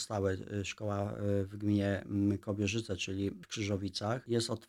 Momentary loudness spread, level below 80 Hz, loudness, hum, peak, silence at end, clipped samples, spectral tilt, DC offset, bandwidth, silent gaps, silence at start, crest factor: 5 LU; -66 dBFS; -35 LUFS; none; -20 dBFS; 0.05 s; under 0.1%; -5.5 dB/octave; under 0.1%; 13 kHz; none; 0 s; 16 dB